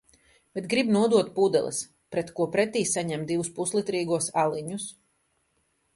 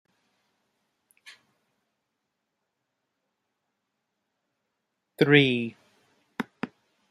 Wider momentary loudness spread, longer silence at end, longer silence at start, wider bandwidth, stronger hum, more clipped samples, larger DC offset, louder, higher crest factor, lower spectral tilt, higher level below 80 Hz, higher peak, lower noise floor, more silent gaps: second, 11 LU vs 20 LU; first, 1.05 s vs 0.45 s; second, 0.55 s vs 5.2 s; second, 11.5 kHz vs 14.5 kHz; neither; neither; neither; second, -26 LUFS vs -23 LUFS; second, 18 dB vs 26 dB; second, -4.5 dB/octave vs -6.5 dB/octave; first, -66 dBFS vs -74 dBFS; about the same, -8 dBFS vs -6 dBFS; second, -72 dBFS vs -81 dBFS; neither